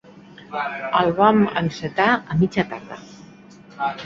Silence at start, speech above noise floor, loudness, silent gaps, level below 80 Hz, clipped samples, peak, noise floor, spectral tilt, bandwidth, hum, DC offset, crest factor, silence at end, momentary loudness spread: 0.15 s; 25 dB; -20 LUFS; none; -52 dBFS; under 0.1%; -2 dBFS; -45 dBFS; -7 dB/octave; 7.4 kHz; none; under 0.1%; 20 dB; 0 s; 16 LU